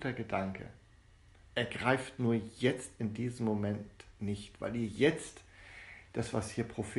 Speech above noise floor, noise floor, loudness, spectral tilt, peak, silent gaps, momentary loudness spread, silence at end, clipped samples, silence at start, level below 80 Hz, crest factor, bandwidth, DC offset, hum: 26 dB; -61 dBFS; -35 LUFS; -6 dB/octave; -14 dBFS; none; 19 LU; 0 s; under 0.1%; 0 s; -60 dBFS; 22 dB; 11.5 kHz; under 0.1%; none